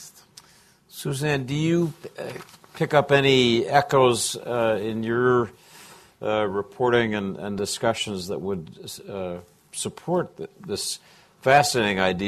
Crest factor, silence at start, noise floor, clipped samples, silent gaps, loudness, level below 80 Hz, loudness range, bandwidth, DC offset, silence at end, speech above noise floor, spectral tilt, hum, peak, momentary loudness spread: 20 dB; 0 s; -56 dBFS; under 0.1%; none; -23 LUFS; -56 dBFS; 8 LU; 14 kHz; under 0.1%; 0 s; 33 dB; -4.5 dB/octave; none; -4 dBFS; 18 LU